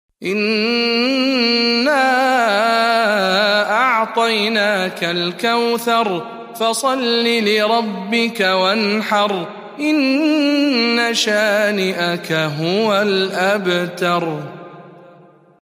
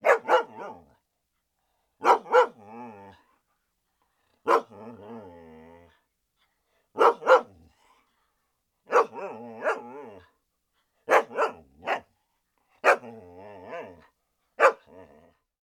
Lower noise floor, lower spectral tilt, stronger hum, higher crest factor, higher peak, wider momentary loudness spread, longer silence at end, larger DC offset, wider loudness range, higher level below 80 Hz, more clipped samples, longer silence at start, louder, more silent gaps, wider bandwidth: second, -47 dBFS vs -79 dBFS; about the same, -4 dB/octave vs -3 dB/octave; neither; second, 14 dB vs 24 dB; about the same, -2 dBFS vs -4 dBFS; second, 5 LU vs 23 LU; second, 0.6 s vs 0.9 s; neither; second, 3 LU vs 7 LU; about the same, -70 dBFS vs -74 dBFS; neither; first, 0.2 s vs 0.05 s; first, -16 LUFS vs -24 LUFS; neither; first, 15.5 kHz vs 14 kHz